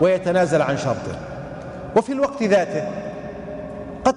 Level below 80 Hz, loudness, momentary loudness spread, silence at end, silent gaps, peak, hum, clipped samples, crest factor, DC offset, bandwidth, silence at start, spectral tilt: -48 dBFS; -21 LUFS; 15 LU; 0 s; none; -6 dBFS; none; under 0.1%; 16 dB; under 0.1%; 11 kHz; 0 s; -6 dB/octave